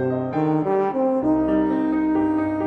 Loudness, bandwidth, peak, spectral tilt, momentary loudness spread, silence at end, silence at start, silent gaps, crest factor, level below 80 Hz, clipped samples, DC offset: -21 LUFS; 4.3 kHz; -10 dBFS; -10 dB/octave; 2 LU; 0 s; 0 s; none; 10 dB; -48 dBFS; under 0.1%; under 0.1%